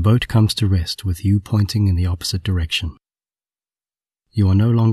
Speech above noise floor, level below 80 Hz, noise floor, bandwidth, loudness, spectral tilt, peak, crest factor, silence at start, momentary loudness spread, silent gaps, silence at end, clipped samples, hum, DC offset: over 73 dB; -34 dBFS; under -90 dBFS; 13.5 kHz; -19 LUFS; -6 dB/octave; -2 dBFS; 16 dB; 0 s; 7 LU; none; 0 s; under 0.1%; none; under 0.1%